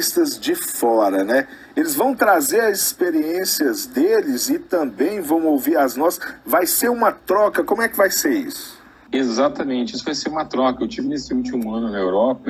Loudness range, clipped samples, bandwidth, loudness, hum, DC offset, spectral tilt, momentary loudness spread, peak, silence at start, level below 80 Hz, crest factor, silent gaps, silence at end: 4 LU; under 0.1%; 17 kHz; -19 LUFS; none; under 0.1%; -2.5 dB/octave; 7 LU; -2 dBFS; 0 s; -56 dBFS; 16 dB; none; 0 s